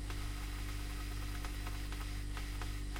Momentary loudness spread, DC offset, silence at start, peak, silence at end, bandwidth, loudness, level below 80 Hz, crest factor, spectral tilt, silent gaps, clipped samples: 0 LU; under 0.1%; 0 s; -28 dBFS; 0 s; 16.5 kHz; -43 LUFS; -42 dBFS; 12 dB; -4.5 dB/octave; none; under 0.1%